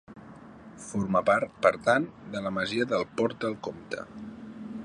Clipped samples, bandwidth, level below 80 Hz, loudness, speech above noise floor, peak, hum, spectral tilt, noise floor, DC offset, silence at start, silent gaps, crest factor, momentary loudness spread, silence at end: under 0.1%; 10.5 kHz; -62 dBFS; -28 LUFS; 20 dB; -4 dBFS; none; -5.5 dB/octave; -48 dBFS; under 0.1%; 0.1 s; none; 24 dB; 22 LU; 0 s